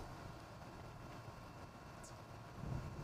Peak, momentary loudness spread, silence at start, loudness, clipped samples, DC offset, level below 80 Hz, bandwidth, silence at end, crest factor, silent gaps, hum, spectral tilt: -32 dBFS; 7 LU; 0 s; -53 LUFS; under 0.1%; under 0.1%; -60 dBFS; 15.5 kHz; 0 s; 18 dB; none; none; -6 dB/octave